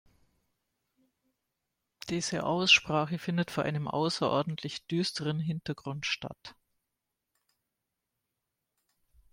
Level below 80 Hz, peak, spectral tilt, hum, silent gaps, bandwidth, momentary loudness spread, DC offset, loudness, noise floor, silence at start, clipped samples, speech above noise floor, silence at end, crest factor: -68 dBFS; -10 dBFS; -4 dB/octave; none; none; 16 kHz; 15 LU; under 0.1%; -30 LUFS; -86 dBFS; 2.05 s; under 0.1%; 55 dB; 2.8 s; 24 dB